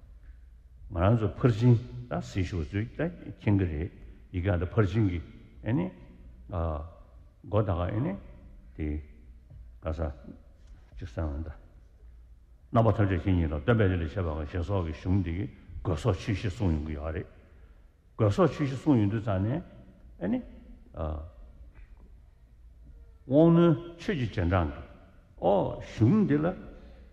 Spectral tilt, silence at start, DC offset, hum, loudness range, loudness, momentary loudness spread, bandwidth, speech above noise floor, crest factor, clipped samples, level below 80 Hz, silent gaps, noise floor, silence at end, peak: -9 dB/octave; 0 s; under 0.1%; none; 11 LU; -29 LUFS; 15 LU; 8.4 kHz; 29 dB; 20 dB; under 0.1%; -44 dBFS; none; -56 dBFS; 0.1 s; -8 dBFS